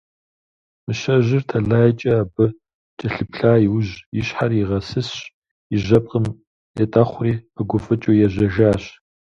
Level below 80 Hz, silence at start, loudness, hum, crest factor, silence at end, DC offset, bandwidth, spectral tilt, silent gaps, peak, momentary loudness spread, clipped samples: -44 dBFS; 0.9 s; -19 LUFS; none; 18 dB; 0.45 s; under 0.1%; 7.4 kHz; -8 dB/octave; 2.74-2.97 s, 4.06-4.12 s, 5.34-5.42 s, 5.51-5.70 s, 6.47-6.74 s; 0 dBFS; 11 LU; under 0.1%